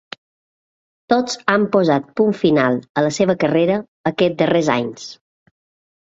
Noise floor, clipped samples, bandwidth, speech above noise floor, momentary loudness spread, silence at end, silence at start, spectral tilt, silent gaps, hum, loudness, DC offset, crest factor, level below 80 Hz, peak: under -90 dBFS; under 0.1%; 7.8 kHz; over 73 dB; 11 LU; 0.9 s; 1.1 s; -5.5 dB/octave; 2.89-2.95 s, 3.88-4.04 s; none; -17 LUFS; under 0.1%; 18 dB; -58 dBFS; -2 dBFS